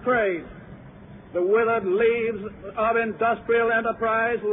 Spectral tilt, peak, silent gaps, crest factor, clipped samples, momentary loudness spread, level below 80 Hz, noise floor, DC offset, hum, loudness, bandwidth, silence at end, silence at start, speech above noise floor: -9.5 dB/octave; -10 dBFS; none; 12 dB; under 0.1%; 12 LU; -54 dBFS; -44 dBFS; under 0.1%; none; -23 LUFS; 3.9 kHz; 0 s; 0 s; 21 dB